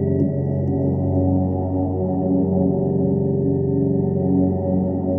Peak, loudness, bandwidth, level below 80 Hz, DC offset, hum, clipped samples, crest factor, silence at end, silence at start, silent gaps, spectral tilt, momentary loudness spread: -6 dBFS; -20 LUFS; 2.1 kHz; -46 dBFS; under 0.1%; none; under 0.1%; 12 dB; 0 s; 0 s; none; -14.5 dB/octave; 3 LU